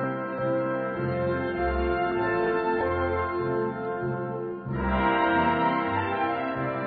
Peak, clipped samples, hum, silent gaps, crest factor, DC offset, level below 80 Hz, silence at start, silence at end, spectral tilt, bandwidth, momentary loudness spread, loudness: -12 dBFS; under 0.1%; none; none; 14 dB; under 0.1%; -42 dBFS; 0 s; 0 s; -10.5 dB/octave; 4.9 kHz; 7 LU; -27 LUFS